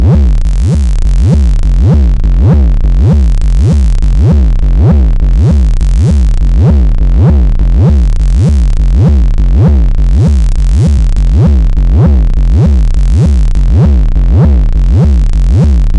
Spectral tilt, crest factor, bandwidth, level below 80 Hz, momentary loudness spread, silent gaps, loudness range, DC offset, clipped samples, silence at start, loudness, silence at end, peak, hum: -8.5 dB/octave; 6 dB; 9 kHz; -6 dBFS; 3 LU; none; 0 LU; 0.5%; under 0.1%; 0 s; -9 LUFS; 0 s; 0 dBFS; none